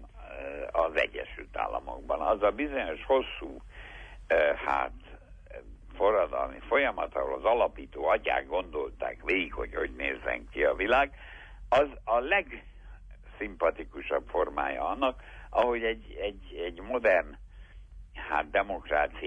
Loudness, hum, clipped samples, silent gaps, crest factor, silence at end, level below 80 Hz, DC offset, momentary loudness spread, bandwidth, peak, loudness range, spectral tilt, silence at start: -30 LUFS; none; under 0.1%; none; 18 dB; 0 s; -48 dBFS; under 0.1%; 17 LU; 8.4 kHz; -12 dBFS; 3 LU; -6 dB/octave; 0 s